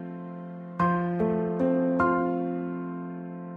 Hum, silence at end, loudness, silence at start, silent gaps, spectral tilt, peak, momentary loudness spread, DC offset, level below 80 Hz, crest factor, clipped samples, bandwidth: none; 0 s; -27 LUFS; 0 s; none; -10.5 dB/octave; -10 dBFS; 14 LU; under 0.1%; -60 dBFS; 18 dB; under 0.1%; 4.7 kHz